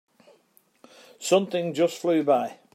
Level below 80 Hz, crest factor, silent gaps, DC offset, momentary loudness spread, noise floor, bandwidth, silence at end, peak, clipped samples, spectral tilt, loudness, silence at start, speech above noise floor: -80 dBFS; 20 dB; none; under 0.1%; 5 LU; -63 dBFS; 16 kHz; 0.2 s; -8 dBFS; under 0.1%; -5 dB/octave; -24 LUFS; 1.2 s; 39 dB